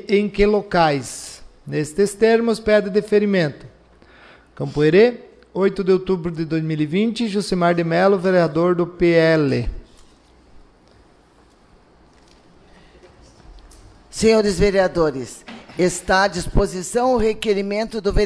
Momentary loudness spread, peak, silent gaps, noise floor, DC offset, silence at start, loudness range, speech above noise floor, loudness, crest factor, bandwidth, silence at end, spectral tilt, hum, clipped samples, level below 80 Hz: 12 LU; -4 dBFS; none; -52 dBFS; under 0.1%; 0 s; 4 LU; 35 dB; -18 LUFS; 16 dB; 11 kHz; 0 s; -5.5 dB/octave; none; under 0.1%; -36 dBFS